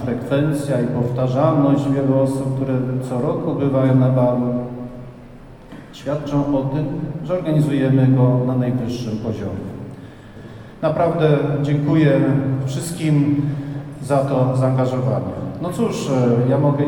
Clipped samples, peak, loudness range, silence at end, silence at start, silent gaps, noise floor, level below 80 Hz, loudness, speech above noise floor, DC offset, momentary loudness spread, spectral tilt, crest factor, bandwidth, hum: under 0.1%; -2 dBFS; 4 LU; 0 s; 0 s; none; -39 dBFS; -46 dBFS; -19 LUFS; 22 dB; under 0.1%; 15 LU; -8 dB/octave; 16 dB; 12 kHz; none